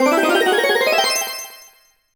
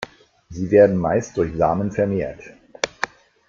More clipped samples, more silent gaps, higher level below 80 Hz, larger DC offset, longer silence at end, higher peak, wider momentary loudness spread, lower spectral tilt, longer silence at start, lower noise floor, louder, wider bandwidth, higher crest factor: neither; neither; second, -64 dBFS vs -48 dBFS; neither; first, 0.6 s vs 0.4 s; about the same, -4 dBFS vs -2 dBFS; second, 13 LU vs 17 LU; second, -0.5 dB/octave vs -6 dB/octave; about the same, 0 s vs 0 s; first, -51 dBFS vs -44 dBFS; first, -16 LUFS vs -20 LUFS; first, over 20 kHz vs 7.6 kHz; second, 14 dB vs 20 dB